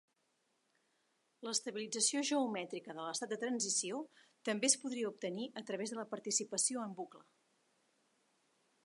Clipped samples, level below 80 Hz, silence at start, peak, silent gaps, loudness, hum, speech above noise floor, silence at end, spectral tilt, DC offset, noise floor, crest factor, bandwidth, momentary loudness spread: under 0.1%; under -90 dBFS; 1.4 s; -16 dBFS; none; -37 LUFS; none; 42 dB; 1.65 s; -2 dB/octave; under 0.1%; -80 dBFS; 24 dB; 11.5 kHz; 13 LU